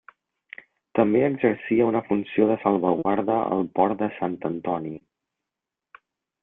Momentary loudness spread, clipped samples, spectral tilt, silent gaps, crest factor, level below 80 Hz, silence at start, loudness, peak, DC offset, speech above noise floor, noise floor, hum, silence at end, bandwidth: 17 LU; under 0.1%; -11 dB/octave; none; 20 dB; -64 dBFS; 0.95 s; -23 LUFS; -4 dBFS; under 0.1%; 64 dB; -87 dBFS; none; 1.45 s; 3.9 kHz